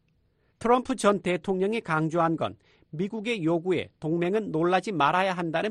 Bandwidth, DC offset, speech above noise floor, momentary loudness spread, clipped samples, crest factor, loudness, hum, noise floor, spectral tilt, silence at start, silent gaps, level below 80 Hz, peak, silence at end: 11.5 kHz; under 0.1%; 42 dB; 8 LU; under 0.1%; 18 dB; -26 LUFS; none; -68 dBFS; -6 dB/octave; 0.6 s; none; -62 dBFS; -8 dBFS; 0 s